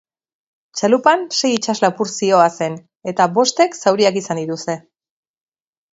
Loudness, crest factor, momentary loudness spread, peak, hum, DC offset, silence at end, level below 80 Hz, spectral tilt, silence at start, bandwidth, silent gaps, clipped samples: -17 LUFS; 18 dB; 11 LU; 0 dBFS; none; under 0.1%; 1.15 s; -68 dBFS; -3.5 dB/octave; 0.75 s; 8 kHz; 2.96-3.00 s; under 0.1%